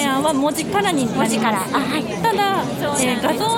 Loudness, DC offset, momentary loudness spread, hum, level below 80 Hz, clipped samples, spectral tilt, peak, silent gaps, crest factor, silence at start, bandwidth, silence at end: -19 LUFS; under 0.1%; 2 LU; none; -52 dBFS; under 0.1%; -4 dB/octave; -4 dBFS; none; 14 dB; 0 s; 18 kHz; 0 s